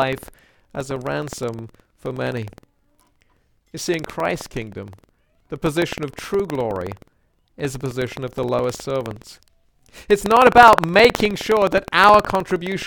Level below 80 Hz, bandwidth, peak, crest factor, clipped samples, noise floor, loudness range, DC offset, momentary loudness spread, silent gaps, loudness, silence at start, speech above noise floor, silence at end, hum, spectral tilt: -46 dBFS; 19 kHz; 0 dBFS; 20 dB; under 0.1%; -61 dBFS; 15 LU; under 0.1%; 21 LU; none; -18 LUFS; 0 s; 43 dB; 0 s; none; -4.5 dB/octave